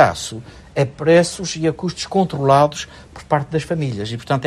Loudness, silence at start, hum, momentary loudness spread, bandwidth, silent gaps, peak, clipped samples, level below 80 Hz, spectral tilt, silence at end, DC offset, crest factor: -18 LUFS; 0 s; none; 15 LU; 13 kHz; none; 0 dBFS; under 0.1%; -48 dBFS; -5.5 dB/octave; 0 s; under 0.1%; 18 dB